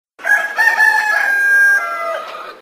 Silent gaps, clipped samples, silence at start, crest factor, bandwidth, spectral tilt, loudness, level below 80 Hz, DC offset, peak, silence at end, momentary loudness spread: none; under 0.1%; 0.2 s; 14 dB; 16 kHz; 1 dB/octave; -12 LUFS; -72 dBFS; under 0.1%; 0 dBFS; 0.05 s; 12 LU